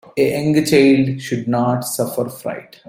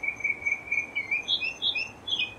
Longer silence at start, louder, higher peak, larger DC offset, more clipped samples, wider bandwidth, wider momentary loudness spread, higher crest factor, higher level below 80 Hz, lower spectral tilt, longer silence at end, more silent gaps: first, 0.15 s vs 0 s; first, -17 LUFS vs -27 LUFS; first, -2 dBFS vs -14 dBFS; neither; neither; first, 16.5 kHz vs 14 kHz; first, 12 LU vs 3 LU; about the same, 16 dB vs 16 dB; first, -54 dBFS vs -62 dBFS; first, -5.5 dB/octave vs -1 dB/octave; first, 0.25 s vs 0 s; neither